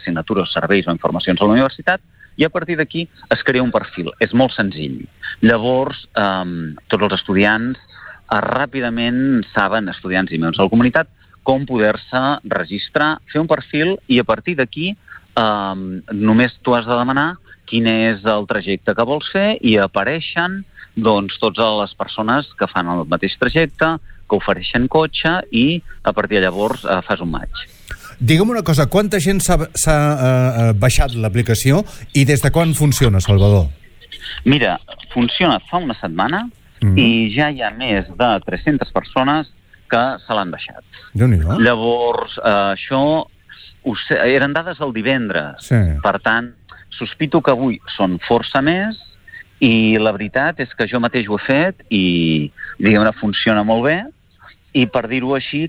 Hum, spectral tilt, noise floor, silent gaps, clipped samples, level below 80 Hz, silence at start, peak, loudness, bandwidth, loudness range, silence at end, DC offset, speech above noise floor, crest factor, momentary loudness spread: none; -5.5 dB/octave; -47 dBFS; none; under 0.1%; -34 dBFS; 0 s; -2 dBFS; -17 LUFS; 19.5 kHz; 3 LU; 0 s; under 0.1%; 31 dB; 14 dB; 9 LU